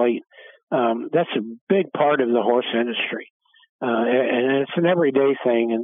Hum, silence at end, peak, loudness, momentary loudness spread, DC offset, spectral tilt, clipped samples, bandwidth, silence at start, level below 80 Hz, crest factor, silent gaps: none; 0 s; -6 dBFS; -21 LUFS; 8 LU; under 0.1%; -9.5 dB/octave; under 0.1%; 3.8 kHz; 0 s; -86 dBFS; 16 dB; 0.63-0.67 s, 1.61-1.67 s, 3.30-3.40 s, 3.69-3.79 s